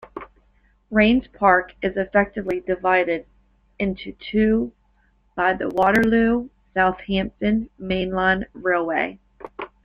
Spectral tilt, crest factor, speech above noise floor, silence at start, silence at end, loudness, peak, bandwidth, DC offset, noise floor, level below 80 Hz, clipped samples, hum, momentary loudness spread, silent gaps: -7 dB/octave; 20 dB; 41 dB; 0.15 s; 0.2 s; -21 LUFS; -2 dBFS; 6.8 kHz; under 0.1%; -61 dBFS; -44 dBFS; under 0.1%; none; 13 LU; none